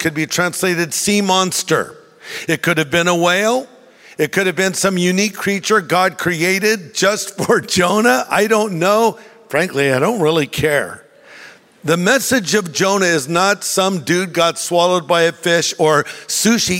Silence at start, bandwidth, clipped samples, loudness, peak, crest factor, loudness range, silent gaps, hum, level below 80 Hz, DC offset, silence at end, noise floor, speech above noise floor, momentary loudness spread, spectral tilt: 0 s; 16.5 kHz; under 0.1%; -15 LUFS; -2 dBFS; 14 dB; 2 LU; none; none; -54 dBFS; under 0.1%; 0 s; -41 dBFS; 25 dB; 5 LU; -3.5 dB/octave